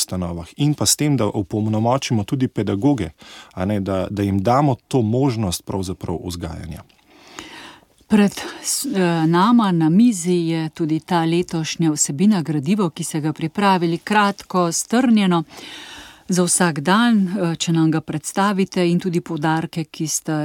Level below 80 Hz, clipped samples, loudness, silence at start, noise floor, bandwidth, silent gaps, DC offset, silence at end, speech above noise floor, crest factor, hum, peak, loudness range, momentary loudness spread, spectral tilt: -50 dBFS; under 0.1%; -19 LUFS; 0 s; -43 dBFS; 17.5 kHz; none; under 0.1%; 0 s; 24 dB; 16 dB; none; -2 dBFS; 5 LU; 13 LU; -5 dB/octave